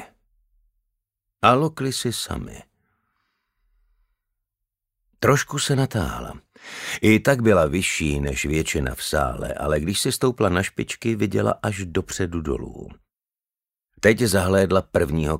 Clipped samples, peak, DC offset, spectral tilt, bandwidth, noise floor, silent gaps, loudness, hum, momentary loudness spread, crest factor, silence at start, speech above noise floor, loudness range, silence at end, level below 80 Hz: under 0.1%; 0 dBFS; under 0.1%; -5 dB/octave; 16 kHz; under -90 dBFS; none; -22 LUFS; none; 12 LU; 24 dB; 0 s; over 68 dB; 6 LU; 0 s; -40 dBFS